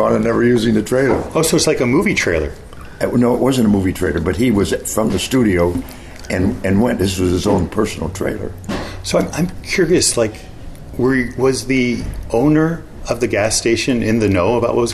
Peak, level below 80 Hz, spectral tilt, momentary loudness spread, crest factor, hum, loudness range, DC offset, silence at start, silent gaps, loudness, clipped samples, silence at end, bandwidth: -2 dBFS; -34 dBFS; -5 dB/octave; 11 LU; 14 dB; none; 3 LU; under 0.1%; 0 s; none; -16 LUFS; under 0.1%; 0 s; 13.5 kHz